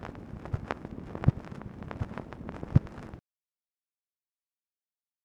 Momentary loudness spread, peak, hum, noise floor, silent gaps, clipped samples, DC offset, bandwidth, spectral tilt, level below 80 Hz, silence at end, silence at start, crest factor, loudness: 16 LU; -8 dBFS; none; under -90 dBFS; none; under 0.1%; under 0.1%; 7.8 kHz; -9 dB/octave; -48 dBFS; 2.05 s; 0 s; 28 dB; -34 LUFS